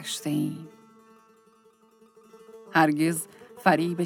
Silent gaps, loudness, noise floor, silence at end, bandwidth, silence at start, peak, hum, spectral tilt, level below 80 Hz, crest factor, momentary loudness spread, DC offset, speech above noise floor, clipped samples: none; -25 LUFS; -60 dBFS; 0 s; 18 kHz; 0 s; -4 dBFS; none; -5 dB/octave; -78 dBFS; 24 dB; 18 LU; under 0.1%; 35 dB; under 0.1%